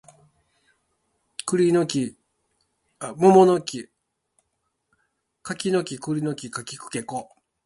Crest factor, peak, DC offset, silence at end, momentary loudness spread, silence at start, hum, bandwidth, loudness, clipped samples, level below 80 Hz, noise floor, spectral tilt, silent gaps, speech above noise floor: 22 dB; -2 dBFS; under 0.1%; 0.4 s; 20 LU; 1.45 s; none; 11.5 kHz; -22 LUFS; under 0.1%; -66 dBFS; -76 dBFS; -5.5 dB/octave; none; 55 dB